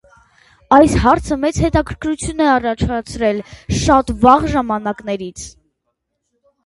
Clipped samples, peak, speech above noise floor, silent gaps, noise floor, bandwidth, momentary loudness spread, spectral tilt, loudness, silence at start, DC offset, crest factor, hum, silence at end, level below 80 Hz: under 0.1%; 0 dBFS; 58 dB; none; -73 dBFS; 11.5 kHz; 13 LU; -5.5 dB/octave; -15 LUFS; 0.7 s; under 0.1%; 16 dB; none; 1.15 s; -30 dBFS